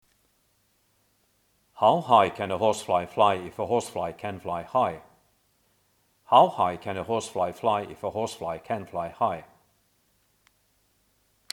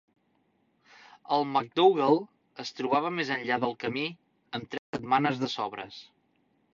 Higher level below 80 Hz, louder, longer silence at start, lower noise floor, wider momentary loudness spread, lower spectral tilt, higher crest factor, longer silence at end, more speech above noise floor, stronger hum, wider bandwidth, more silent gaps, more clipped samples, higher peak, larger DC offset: first, -64 dBFS vs -74 dBFS; about the same, -26 LUFS vs -28 LUFS; first, 1.75 s vs 1.3 s; about the same, -69 dBFS vs -71 dBFS; second, 13 LU vs 16 LU; about the same, -5 dB/octave vs -5.5 dB/octave; about the same, 24 dB vs 20 dB; first, 2.1 s vs 0.75 s; about the same, 43 dB vs 43 dB; neither; first, 16.5 kHz vs 7.4 kHz; second, none vs 4.79-4.93 s; neither; first, -4 dBFS vs -10 dBFS; neither